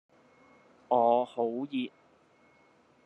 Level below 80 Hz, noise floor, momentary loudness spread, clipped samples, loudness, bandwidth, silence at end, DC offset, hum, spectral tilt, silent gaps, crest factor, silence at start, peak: -84 dBFS; -64 dBFS; 11 LU; under 0.1%; -30 LUFS; 8.4 kHz; 1.2 s; under 0.1%; none; -7 dB/octave; none; 20 dB; 0.9 s; -12 dBFS